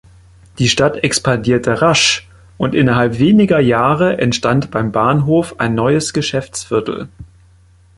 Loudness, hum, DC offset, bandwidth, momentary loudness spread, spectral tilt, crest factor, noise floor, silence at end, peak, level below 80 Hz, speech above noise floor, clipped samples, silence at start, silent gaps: -14 LUFS; none; under 0.1%; 11.5 kHz; 8 LU; -5 dB/octave; 14 dB; -47 dBFS; 0.75 s; 0 dBFS; -42 dBFS; 34 dB; under 0.1%; 0.6 s; none